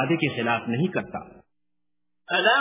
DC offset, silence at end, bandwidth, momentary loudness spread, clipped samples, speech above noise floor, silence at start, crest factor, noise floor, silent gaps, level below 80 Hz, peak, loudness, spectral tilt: under 0.1%; 0 s; 3.9 kHz; 13 LU; under 0.1%; 60 dB; 0 s; 18 dB; -84 dBFS; none; -62 dBFS; -8 dBFS; -24 LUFS; -3 dB/octave